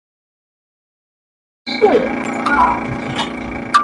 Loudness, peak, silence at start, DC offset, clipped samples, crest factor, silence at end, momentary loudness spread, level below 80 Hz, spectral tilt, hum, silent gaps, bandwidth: -17 LUFS; 0 dBFS; 1.65 s; under 0.1%; under 0.1%; 18 dB; 0 s; 11 LU; -42 dBFS; -5 dB/octave; none; none; 11.5 kHz